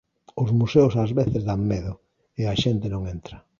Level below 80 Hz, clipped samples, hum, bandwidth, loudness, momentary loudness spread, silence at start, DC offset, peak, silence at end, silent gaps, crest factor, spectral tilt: -44 dBFS; under 0.1%; none; 7.2 kHz; -23 LUFS; 20 LU; 0.35 s; under 0.1%; -4 dBFS; 0.2 s; none; 18 dB; -7.5 dB/octave